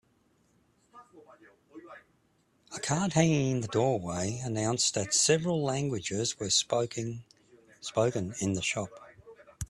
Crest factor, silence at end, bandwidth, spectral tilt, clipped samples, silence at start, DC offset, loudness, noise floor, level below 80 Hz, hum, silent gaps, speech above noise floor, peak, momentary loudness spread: 22 dB; 0.05 s; 13 kHz; -4 dB/octave; under 0.1%; 0.95 s; under 0.1%; -29 LUFS; -70 dBFS; -60 dBFS; none; none; 40 dB; -10 dBFS; 13 LU